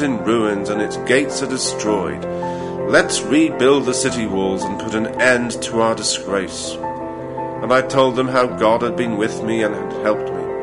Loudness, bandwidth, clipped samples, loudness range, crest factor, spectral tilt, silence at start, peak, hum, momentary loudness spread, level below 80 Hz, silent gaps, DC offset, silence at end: -18 LUFS; 11 kHz; under 0.1%; 2 LU; 16 dB; -4 dB/octave; 0 s; -2 dBFS; none; 9 LU; -50 dBFS; none; under 0.1%; 0 s